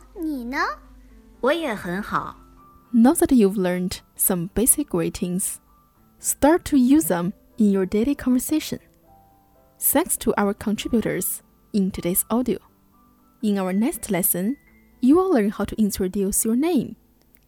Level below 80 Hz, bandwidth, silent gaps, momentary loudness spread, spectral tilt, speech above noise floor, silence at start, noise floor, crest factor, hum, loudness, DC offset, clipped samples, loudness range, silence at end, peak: -48 dBFS; over 20 kHz; none; 11 LU; -4.5 dB/octave; 36 dB; 0.15 s; -57 dBFS; 20 dB; none; -22 LUFS; under 0.1%; under 0.1%; 4 LU; 0.55 s; -2 dBFS